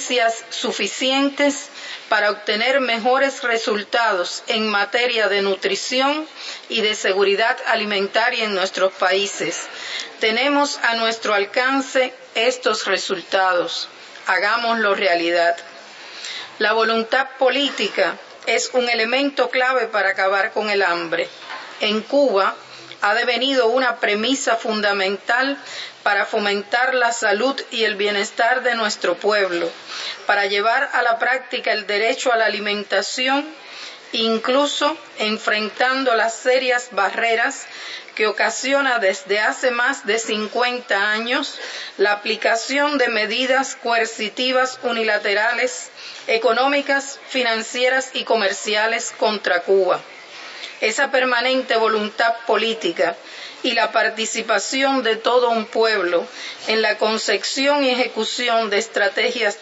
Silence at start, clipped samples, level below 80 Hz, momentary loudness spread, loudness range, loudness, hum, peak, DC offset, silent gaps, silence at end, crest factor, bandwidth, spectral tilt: 0 s; under 0.1%; -80 dBFS; 7 LU; 1 LU; -19 LUFS; none; -2 dBFS; under 0.1%; none; 0 s; 16 dB; 8 kHz; -2 dB/octave